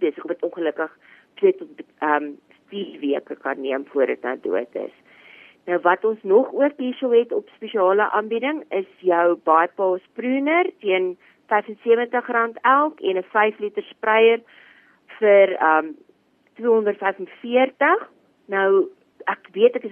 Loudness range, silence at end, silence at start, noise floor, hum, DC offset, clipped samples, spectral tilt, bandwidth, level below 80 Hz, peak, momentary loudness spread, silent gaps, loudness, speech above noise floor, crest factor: 6 LU; 0 s; 0 s; -59 dBFS; none; under 0.1%; under 0.1%; -7.5 dB/octave; 3.6 kHz; -84 dBFS; -2 dBFS; 12 LU; none; -21 LUFS; 39 dB; 18 dB